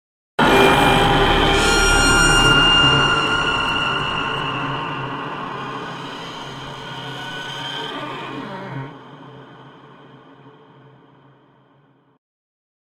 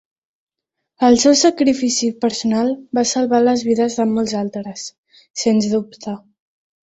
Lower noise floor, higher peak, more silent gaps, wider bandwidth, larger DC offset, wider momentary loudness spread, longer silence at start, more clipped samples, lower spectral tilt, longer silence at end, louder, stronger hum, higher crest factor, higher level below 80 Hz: second, -56 dBFS vs -79 dBFS; about the same, 0 dBFS vs -2 dBFS; second, none vs 4.98-5.03 s, 5.30-5.34 s; first, 16 kHz vs 8.2 kHz; neither; about the same, 18 LU vs 17 LU; second, 0.4 s vs 1 s; neither; about the same, -3.5 dB/octave vs -4 dB/octave; first, 2.4 s vs 0.75 s; about the same, -16 LUFS vs -17 LUFS; neither; about the same, 20 dB vs 16 dB; first, -32 dBFS vs -58 dBFS